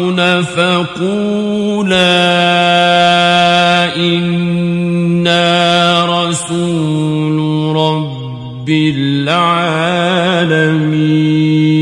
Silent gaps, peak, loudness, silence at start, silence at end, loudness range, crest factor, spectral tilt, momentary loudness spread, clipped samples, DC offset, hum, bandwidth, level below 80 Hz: none; 0 dBFS; -11 LUFS; 0 s; 0 s; 4 LU; 12 dB; -5.5 dB/octave; 6 LU; under 0.1%; under 0.1%; none; 11.5 kHz; -50 dBFS